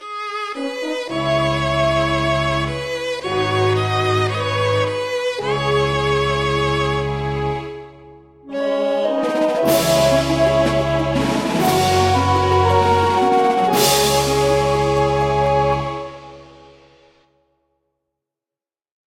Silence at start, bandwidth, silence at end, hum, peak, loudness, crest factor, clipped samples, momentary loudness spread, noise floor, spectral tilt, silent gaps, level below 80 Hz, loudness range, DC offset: 0 s; 16.5 kHz; 2.6 s; none; -2 dBFS; -18 LUFS; 16 dB; under 0.1%; 9 LU; under -90 dBFS; -5 dB/octave; none; -38 dBFS; 6 LU; under 0.1%